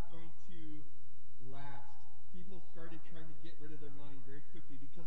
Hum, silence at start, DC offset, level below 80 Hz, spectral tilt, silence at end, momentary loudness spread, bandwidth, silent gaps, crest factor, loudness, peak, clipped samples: none; 0 s; 5%; -72 dBFS; -7.5 dB/octave; 0 s; 7 LU; 7.6 kHz; none; 16 dB; -56 LUFS; -26 dBFS; under 0.1%